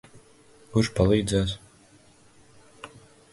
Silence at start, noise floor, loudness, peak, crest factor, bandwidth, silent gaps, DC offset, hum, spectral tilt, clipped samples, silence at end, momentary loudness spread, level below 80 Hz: 0.7 s; -56 dBFS; -24 LUFS; -8 dBFS; 20 dB; 11.5 kHz; none; under 0.1%; none; -6 dB/octave; under 0.1%; 0.45 s; 24 LU; -44 dBFS